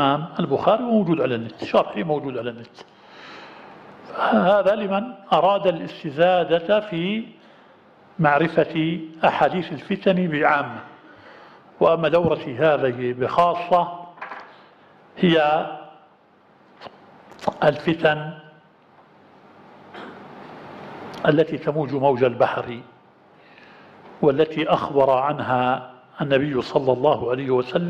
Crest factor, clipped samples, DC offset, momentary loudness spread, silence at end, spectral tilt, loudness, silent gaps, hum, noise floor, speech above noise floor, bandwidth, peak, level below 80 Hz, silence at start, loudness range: 18 dB; under 0.1%; under 0.1%; 20 LU; 0 s; -7.5 dB/octave; -21 LUFS; none; none; -55 dBFS; 35 dB; 8.2 kHz; -4 dBFS; -60 dBFS; 0 s; 5 LU